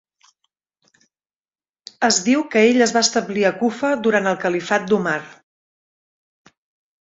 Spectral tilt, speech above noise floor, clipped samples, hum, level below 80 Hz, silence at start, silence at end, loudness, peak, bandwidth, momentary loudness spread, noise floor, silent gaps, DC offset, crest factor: -3 dB/octave; over 72 dB; under 0.1%; none; -64 dBFS; 2 s; 1.7 s; -18 LUFS; -2 dBFS; 8 kHz; 7 LU; under -90 dBFS; none; under 0.1%; 18 dB